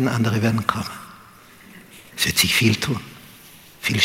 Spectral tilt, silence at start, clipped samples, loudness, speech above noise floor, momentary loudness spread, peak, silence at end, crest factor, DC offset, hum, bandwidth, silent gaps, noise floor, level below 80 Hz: -3.5 dB/octave; 0 s; under 0.1%; -20 LUFS; 26 dB; 23 LU; -2 dBFS; 0 s; 22 dB; under 0.1%; none; 17 kHz; none; -47 dBFS; -50 dBFS